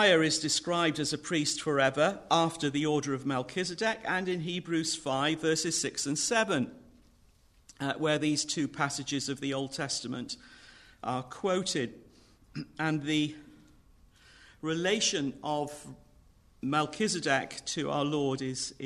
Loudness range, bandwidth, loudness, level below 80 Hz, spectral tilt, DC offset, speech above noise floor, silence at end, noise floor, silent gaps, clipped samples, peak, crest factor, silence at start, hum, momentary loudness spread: 5 LU; 13.5 kHz; -30 LUFS; -64 dBFS; -3.5 dB/octave; under 0.1%; 32 dB; 0 s; -62 dBFS; none; under 0.1%; -12 dBFS; 20 dB; 0 s; none; 10 LU